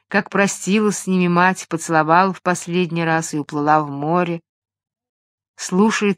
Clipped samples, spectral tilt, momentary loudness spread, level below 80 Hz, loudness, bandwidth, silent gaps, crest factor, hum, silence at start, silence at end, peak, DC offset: under 0.1%; -5 dB/octave; 8 LU; -66 dBFS; -18 LUFS; 14.5 kHz; 4.49-4.62 s, 5.09-5.38 s, 5.48-5.54 s; 18 dB; none; 0.1 s; 0.05 s; 0 dBFS; under 0.1%